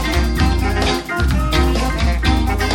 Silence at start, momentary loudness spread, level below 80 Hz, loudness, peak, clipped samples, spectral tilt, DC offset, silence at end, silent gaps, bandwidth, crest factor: 0 s; 2 LU; -18 dBFS; -17 LUFS; -2 dBFS; under 0.1%; -5.5 dB/octave; under 0.1%; 0 s; none; 17 kHz; 14 dB